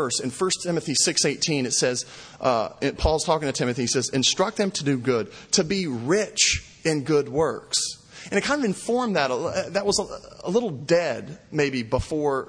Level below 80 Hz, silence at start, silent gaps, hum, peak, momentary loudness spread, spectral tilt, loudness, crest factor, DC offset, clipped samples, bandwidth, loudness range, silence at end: -44 dBFS; 0 s; none; none; -6 dBFS; 7 LU; -3.5 dB/octave; -23 LUFS; 18 dB; under 0.1%; under 0.1%; 10.5 kHz; 2 LU; 0 s